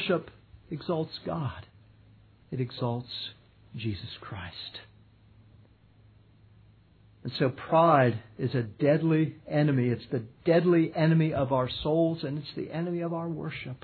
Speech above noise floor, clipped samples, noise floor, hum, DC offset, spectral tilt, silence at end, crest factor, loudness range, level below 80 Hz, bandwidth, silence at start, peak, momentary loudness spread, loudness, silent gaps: 31 dB; under 0.1%; -59 dBFS; none; under 0.1%; -10.5 dB/octave; 0.05 s; 20 dB; 16 LU; -60 dBFS; 4.6 kHz; 0 s; -8 dBFS; 16 LU; -28 LUFS; none